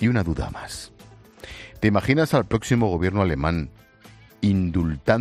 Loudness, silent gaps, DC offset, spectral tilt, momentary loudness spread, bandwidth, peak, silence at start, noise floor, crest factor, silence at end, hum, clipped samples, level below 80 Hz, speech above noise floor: -22 LUFS; none; under 0.1%; -7 dB/octave; 19 LU; 14.5 kHz; -6 dBFS; 0 s; -49 dBFS; 18 dB; 0 s; none; under 0.1%; -40 dBFS; 28 dB